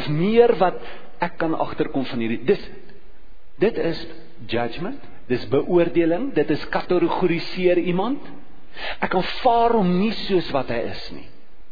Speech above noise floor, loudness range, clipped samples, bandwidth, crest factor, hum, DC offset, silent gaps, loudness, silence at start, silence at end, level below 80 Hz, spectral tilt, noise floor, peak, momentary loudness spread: 27 dB; 5 LU; under 0.1%; 5 kHz; 20 dB; none; 4%; none; -22 LUFS; 0 s; 0.2 s; -46 dBFS; -8.5 dB/octave; -48 dBFS; -4 dBFS; 15 LU